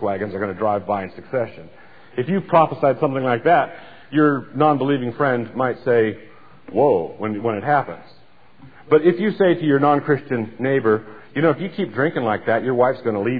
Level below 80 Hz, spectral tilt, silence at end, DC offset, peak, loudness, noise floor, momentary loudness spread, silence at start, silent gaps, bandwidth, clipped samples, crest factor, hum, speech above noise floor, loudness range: -62 dBFS; -10.5 dB/octave; 0 s; 0.5%; -2 dBFS; -20 LUFS; -49 dBFS; 9 LU; 0 s; none; 4.9 kHz; under 0.1%; 16 dB; none; 30 dB; 3 LU